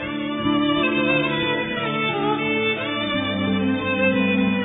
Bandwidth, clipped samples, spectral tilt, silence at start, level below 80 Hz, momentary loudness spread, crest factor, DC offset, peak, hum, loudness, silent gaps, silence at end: 3.9 kHz; under 0.1%; -8.5 dB/octave; 0 s; -52 dBFS; 4 LU; 14 dB; under 0.1%; -6 dBFS; none; -21 LUFS; none; 0 s